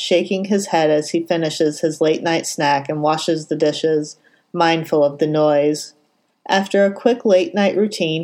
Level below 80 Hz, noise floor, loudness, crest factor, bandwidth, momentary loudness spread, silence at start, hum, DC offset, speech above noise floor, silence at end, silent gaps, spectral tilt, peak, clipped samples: -74 dBFS; -54 dBFS; -18 LUFS; 16 dB; 16.5 kHz; 5 LU; 0 s; none; under 0.1%; 37 dB; 0 s; none; -4.5 dB/octave; 0 dBFS; under 0.1%